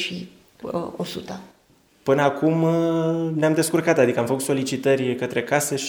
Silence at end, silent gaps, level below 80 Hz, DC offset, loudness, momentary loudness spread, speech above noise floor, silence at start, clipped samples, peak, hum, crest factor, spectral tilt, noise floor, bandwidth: 0 s; none; -64 dBFS; under 0.1%; -22 LUFS; 14 LU; 37 dB; 0 s; under 0.1%; -4 dBFS; none; 20 dB; -5 dB/octave; -58 dBFS; over 20 kHz